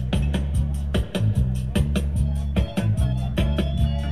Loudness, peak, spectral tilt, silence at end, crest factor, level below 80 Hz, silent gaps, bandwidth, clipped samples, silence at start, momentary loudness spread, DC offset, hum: -24 LUFS; -8 dBFS; -7 dB/octave; 0 s; 14 dB; -26 dBFS; none; 13 kHz; under 0.1%; 0 s; 2 LU; 1%; none